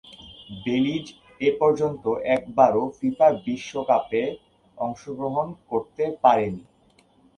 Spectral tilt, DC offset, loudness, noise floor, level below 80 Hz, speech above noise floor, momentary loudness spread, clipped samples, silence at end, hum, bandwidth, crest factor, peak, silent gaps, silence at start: -6.5 dB/octave; under 0.1%; -24 LUFS; -59 dBFS; -60 dBFS; 37 dB; 13 LU; under 0.1%; 0.75 s; none; 9.6 kHz; 22 dB; -2 dBFS; none; 0.1 s